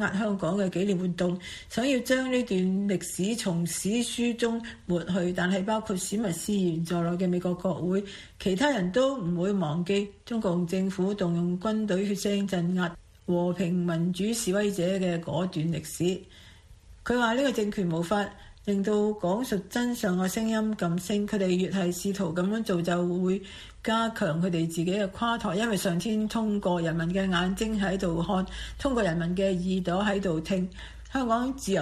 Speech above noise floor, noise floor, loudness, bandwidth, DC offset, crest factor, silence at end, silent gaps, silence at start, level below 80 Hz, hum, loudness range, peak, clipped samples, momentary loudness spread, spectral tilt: 24 dB; -51 dBFS; -28 LUFS; 14.5 kHz; under 0.1%; 18 dB; 0 s; none; 0 s; -50 dBFS; none; 1 LU; -10 dBFS; under 0.1%; 4 LU; -5.5 dB/octave